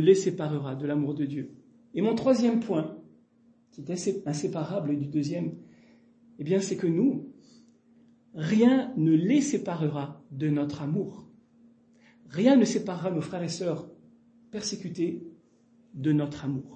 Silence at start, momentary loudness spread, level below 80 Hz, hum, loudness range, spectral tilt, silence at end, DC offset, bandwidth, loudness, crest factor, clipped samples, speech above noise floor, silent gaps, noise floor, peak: 0 s; 16 LU; -70 dBFS; none; 6 LU; -6.5 dB/octave; 0 s; under 0.1%; 8.8 kHz; -28 LUFS; 20 dB; under 0.1%; 36 dB; none; -62 dBFS; -8 dBFS